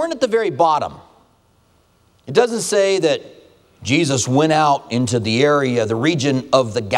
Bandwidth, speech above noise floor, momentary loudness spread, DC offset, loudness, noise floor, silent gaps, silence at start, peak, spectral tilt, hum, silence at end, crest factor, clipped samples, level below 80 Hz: 14 kHz; 40 dB; 4 LU; under 0.1%; -17 LUFS; -57 dBFS; none; 0 s; 0 dBFS; -4.5 dB/octave; none; 0 s; 18 dB; under 0.1%; -58 dBFS